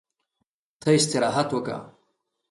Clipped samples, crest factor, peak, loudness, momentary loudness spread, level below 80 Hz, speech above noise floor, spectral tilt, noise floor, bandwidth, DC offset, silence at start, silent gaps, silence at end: under 0.1%; 18 dB; -8 dBFS; -23 LUFS; 13 LU; -66 dBFS; 56 dB; -4.5 dB/octave; -79 dBFS; 11.5 kHz; under 0.1%; 0.8 s; none; 0.6 s